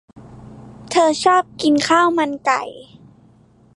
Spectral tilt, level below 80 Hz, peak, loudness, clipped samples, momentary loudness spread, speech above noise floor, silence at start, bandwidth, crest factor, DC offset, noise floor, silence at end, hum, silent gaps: -3.5 dB/octave; -56 dBFS; -2 dBFS; -17 LUFS; under 0.1%; 7 LU; 34 dB; 0.15 s; 11.5 kHz; 16 dB; under 0.1%; -51 dBFS; 0.95 s; none; none